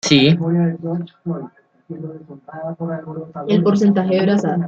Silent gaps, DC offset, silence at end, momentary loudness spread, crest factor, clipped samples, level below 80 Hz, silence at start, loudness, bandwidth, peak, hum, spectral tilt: none; under 0.1%; 0 s; 19 LU; 18 dB; under 0.1%; -58 dBFS; 0.05 s; -18 LUFS; 8.2 kHz; 0 dBFS; none; -6 dB/octave